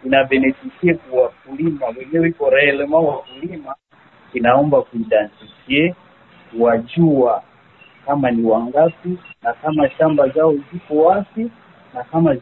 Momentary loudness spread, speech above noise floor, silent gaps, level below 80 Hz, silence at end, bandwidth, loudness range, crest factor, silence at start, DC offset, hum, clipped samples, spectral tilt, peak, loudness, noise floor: 14 LU; 33 dB; none; -54 dBFS; 0 s; 4.2 kHz; 2 LU; 16 dB; 0.05 s; under 0.1%; none; under 0.1%; -11 dB/octave; 0 dBFS; -17 LUFS; -49 dBFS